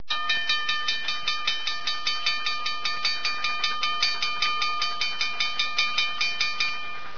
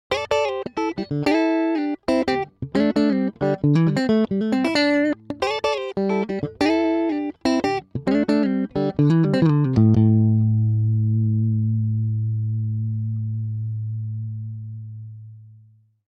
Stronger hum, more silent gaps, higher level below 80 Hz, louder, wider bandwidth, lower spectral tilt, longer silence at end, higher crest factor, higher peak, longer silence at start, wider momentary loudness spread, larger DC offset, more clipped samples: neither; neither; second, -60 dBFS vs -52 dBFS; second, -24 LUFS vs -21 LUFS; second, 5.4 kHz vs 9.2 kHz; second, 0.5 dB/octave vs -8 dB/octave; second, 0 s vs 0.65 s; about the same, 20 dB vs 16 dB; about the same, -8 dBFS vs -6 dBFS; about the same, 0.1 s vs 0.1 s; second, 3 LU vs 10 LU; first, 3% vs under 0.1%; neither